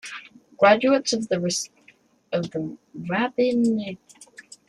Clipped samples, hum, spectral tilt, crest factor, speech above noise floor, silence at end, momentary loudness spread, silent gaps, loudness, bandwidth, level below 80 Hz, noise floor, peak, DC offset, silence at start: under 0.1%; none; -4.5 dB/octave; 20 dB; 35 dB; 0.3 s; 19 LU; none; -22 LUFS; 12.5 kHz; -66 dBFS; -58 dBFS; -4 dBFS; under 0.1%; 0.05 s